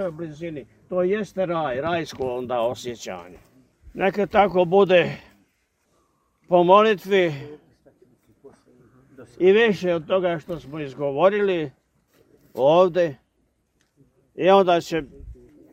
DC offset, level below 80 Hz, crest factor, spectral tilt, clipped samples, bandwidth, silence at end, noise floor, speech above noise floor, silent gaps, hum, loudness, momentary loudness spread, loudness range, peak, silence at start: under 0.1%; -56 dBFS; 22 dB; -6 dB/octave; under 0.1%; 15 kHz; 0.4 s; -68 dBFS; 48 dB; none; none; -21 LUFS; 18 LU; 6 LU; -2 dBFS; 0 s